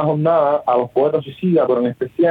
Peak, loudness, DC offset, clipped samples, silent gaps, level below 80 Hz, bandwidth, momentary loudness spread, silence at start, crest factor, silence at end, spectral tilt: -4 dBFS; -17 LUFS; under 0.1%; under 0.1%; none; -62 dBFS; 4.8 kHz; 4 LU; 0 s; 12 dB; 0 s; -10 dB/octave